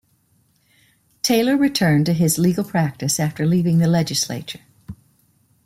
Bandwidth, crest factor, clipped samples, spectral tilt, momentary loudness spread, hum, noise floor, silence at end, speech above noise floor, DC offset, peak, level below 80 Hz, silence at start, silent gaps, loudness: 16 kHz; 16 dB; under 0.1%; -5 dB/octave; 8 LU; none; -62 dBFS; 0.7 s; 43 dB; under 0.1%; -4 dBFS; -56 dBFS; 1.25 s; none; -19 LUFS